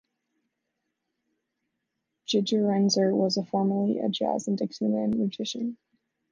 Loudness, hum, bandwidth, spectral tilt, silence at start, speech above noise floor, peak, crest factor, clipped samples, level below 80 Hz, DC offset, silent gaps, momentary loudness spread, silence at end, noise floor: -26 LUFS; none; 7.6 kHz; -5.5 dB/octave; 2.3 s; 56 dB; -12 dBFS; 16 dB; under 0.1%; -72 dBFS; under 0.1%; none; 8 LU; 0.6 s; -82 dBFS